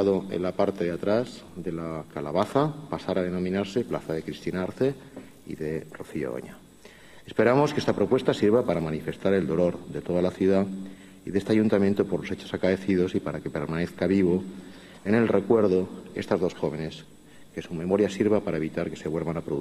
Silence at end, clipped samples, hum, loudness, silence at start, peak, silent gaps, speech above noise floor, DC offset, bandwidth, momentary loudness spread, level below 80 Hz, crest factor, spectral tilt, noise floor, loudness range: 0 s; under 0.1%; none; -26 LUFS; 0 s; -8 dBFS; none; 24 dB; under 0.1%; 13.5 kHz; 14 LU; -56 dBFS; 18 dB; -7 dB/octave; -50 dBFS; 5 LU